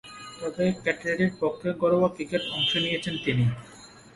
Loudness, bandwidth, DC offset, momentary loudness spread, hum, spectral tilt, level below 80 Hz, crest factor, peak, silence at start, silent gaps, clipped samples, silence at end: -26 LUFS; 11.5 kHz; under 0.1%; 12 LU; none; -5.5 dB/octave; -58 dBFS; 18 dB; -8 dBFS; 0.05 s; none; under 0.1%; 0.15 s